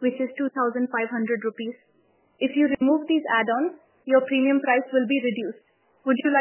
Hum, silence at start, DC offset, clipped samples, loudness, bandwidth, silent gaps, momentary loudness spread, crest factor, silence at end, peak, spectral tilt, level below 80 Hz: none; 0 s; under 0.1%; under 0.1%; -24 LUFS; 3.2 kHz; none; 10 LU; 16 dB; 0 s; -8 dBFS; -8.5 dB/octave; -68 dBFS